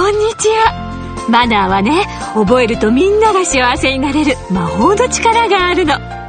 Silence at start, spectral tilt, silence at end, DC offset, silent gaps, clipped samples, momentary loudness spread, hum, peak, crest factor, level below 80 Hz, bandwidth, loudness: 0 s; -4 dB/octave; 0 s; under 0.1%; none; under 0.1%; 6 LU; none; 0 dBFS; 12 dB; -32 dBFS; 9.6 kHz; -12 LUFS